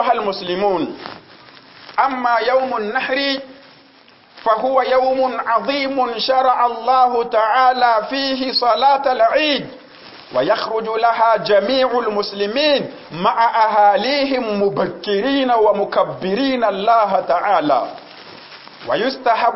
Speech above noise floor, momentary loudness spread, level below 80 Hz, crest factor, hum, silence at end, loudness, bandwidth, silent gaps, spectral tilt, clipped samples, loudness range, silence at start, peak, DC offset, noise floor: 32 dB; 8 LU; -58 dBFS; 14 dB; none; 0 s; -17 LUFS; 5.8 kHz; none; -7.5 dB/octave; under 0.1%; 4 LU; 0 s; -2 dBFS; under 0.1%; -48 dBFS